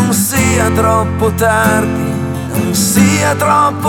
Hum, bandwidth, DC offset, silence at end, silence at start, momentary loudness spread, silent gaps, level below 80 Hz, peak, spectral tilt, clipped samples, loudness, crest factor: none; 18.5 kHz; under 0.1%; 0 s; 0 s; 7 LU; none; -38 dBFS; 0 dBFS; -4.5 dB/octave; under 0.1%; -12 LUFS; 12 dB